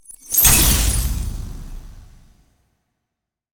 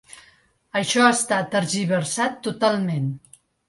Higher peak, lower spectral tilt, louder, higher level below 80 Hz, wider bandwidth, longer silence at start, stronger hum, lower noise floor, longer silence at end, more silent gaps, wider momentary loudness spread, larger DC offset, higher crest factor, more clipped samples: about the same, 0 dBFS vs -2 dBFS; second, -2 dB/octave vs -4 dB/octave; first, -15 LUFS vs -22 LUFS; first, -26 dBFS vs -64 dBFS; first, over 20 kHz vs 11.5 kHz; second, 0.25 s vs 0.75 s; neither; first, -81 dBFS vs -57 dBFS; first, 1.5 s vs 0.5 s; neither; first, 23 LU vs 10 LU; neither; about the same, 20 dB vs 20 dB; neither